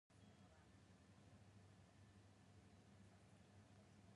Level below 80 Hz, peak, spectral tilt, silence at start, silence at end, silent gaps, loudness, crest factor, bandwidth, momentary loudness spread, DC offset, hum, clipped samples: -80 dBFS; -56 dBFS; -5.5 dB/octave; 0.1 s; 0 s; none; -69 LUFS; 14 dB; 11 kHz; 1 LU; under 0.1%; none; under 0.1%